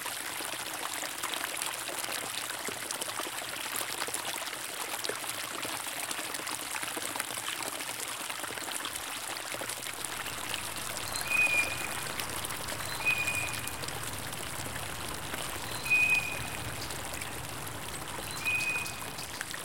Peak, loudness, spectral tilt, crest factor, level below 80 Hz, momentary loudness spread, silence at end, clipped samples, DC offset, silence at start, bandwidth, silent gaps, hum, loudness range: -10 dBFS; -33 LUFS; -1 dB/octave; 26 dB; -58 dBFS; 9 LU; 0 s; under 0.1%; under 0.1%; 0 s; 17 kHz; none; none; 4 LU